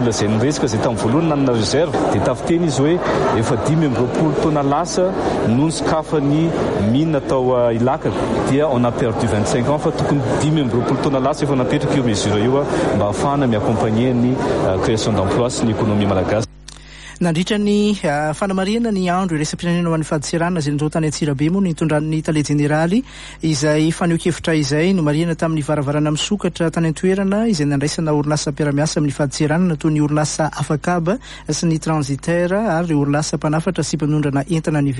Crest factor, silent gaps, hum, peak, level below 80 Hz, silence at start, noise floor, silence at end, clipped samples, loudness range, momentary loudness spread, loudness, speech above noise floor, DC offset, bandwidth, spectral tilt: 14 dB; none; none; -4 dBFS; -40 dBFS; 0 s; -38 dBFS; 0 s; under 0.1%; 2 LU; 3 LU; -18 LUFS; 21 dB; under 0.1%; 11.5 kHz; -6 dB/octave